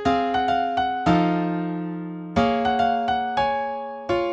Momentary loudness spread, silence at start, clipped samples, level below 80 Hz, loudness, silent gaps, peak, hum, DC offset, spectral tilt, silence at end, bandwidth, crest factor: 9 LU; 0 s; under 0.1%; -48 dBFS; -23 LUFS; none; -6 dBFS; none; under 0.1%; -7 dB/octave; 0 s; 8 kHz; 16 dB